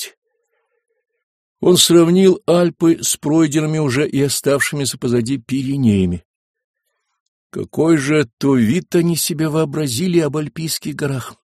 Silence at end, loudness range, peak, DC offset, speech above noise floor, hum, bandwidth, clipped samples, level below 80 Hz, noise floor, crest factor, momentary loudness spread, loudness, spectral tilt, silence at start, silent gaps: 0.15 s; 5 LU; 0 dBFS; under 0.1%; 53 dB; none; 15.5 kHz; under 0.1%; -52 dBFS; -68 dBFS; 16 dB; 10 LU; -16 LUFS; -5 dB/octave; 0 s; 0.17-0.22 s, 1.23-1.56 s, 6.25-6.54 s, 6.64-6.74 s, 7.20-7.50 s, 8.33-8.37 s